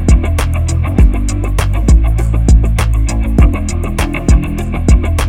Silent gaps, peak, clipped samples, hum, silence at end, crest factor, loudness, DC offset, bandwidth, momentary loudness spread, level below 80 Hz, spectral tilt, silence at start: none; 0 dBFS; under 0.1%; none; 0 s; 10 dB; -13 LUFS; under 0.1%; 12.5 kHz; 6 LU; -12 dBFS; -6.5 dB/octave; 0 s